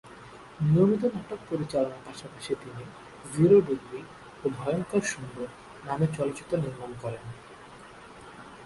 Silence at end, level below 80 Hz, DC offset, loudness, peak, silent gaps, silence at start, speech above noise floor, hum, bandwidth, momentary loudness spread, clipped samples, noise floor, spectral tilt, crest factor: 0 s; -60 dBFS; under 0.1%; -28 LUFS; -10 dBFS; none; 0.05 s; 20 dB; none; 11.5 kHz; 25 LU; under 0.1%; -48 dBFS; -7 dB/octave; 20 dB